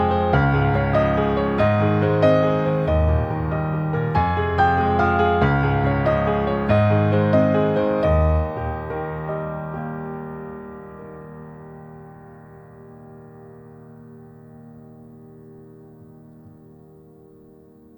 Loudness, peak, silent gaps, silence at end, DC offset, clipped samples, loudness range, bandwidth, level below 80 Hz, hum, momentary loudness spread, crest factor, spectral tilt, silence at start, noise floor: -20 LUFS; -4 dBFS; none; 1.5 s; under 0.1%; under 0.1%; 20 LU; over 20 kHz; -34 dBFS; none; 20 LU; 18 dB; -9.5 dB/octave; 0 s; -48 dBFS